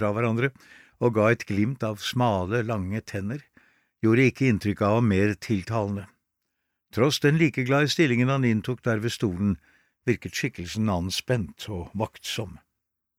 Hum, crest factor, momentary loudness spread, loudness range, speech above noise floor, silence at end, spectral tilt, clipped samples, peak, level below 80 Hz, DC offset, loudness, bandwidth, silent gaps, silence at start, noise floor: none; 18 dB; 11 LU; 5 LU; 57 dB; 0.65 s; -6 dB/octave; under 0.1%; -8 dBFS; -56 dBFS; under 0.1%; -25 LUFS; 16 kHz; none; 0 s; -82 dBFS